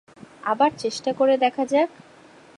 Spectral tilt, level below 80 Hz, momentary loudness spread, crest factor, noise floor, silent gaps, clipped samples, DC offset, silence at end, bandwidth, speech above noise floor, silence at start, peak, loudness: -4 dB/octave; -70 dBFS; 8 LU; 16 dB; -49 dBFS; none; under 0.1%; under 0.1%; 0.7 s; 11 kHz; 28 dB; 0.45 s; -6 dBFS; -22 LUFS